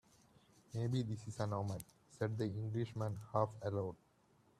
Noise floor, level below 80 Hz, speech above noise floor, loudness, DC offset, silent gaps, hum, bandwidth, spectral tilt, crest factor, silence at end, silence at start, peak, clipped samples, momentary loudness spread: -72 dBFS; -72 dBFS; 32 dB; -42 LUFS; under 0.1%; none; none; 14 kHz; -7.5 dB/octave; 22 dB; 0.65 s; 0.7 s; -20 dBFS; under 0.1%; 9 LU